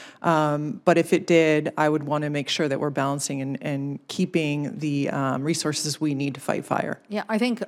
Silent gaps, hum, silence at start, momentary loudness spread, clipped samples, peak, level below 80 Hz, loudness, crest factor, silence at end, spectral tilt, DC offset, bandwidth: none; none; 0 s; 9 LU; under 0.1%; -6 dBFS; -72 dBFS; -24 LUFS; 18 dB; 0 s; -5 dB/octave; under 0.1%; 16 kHz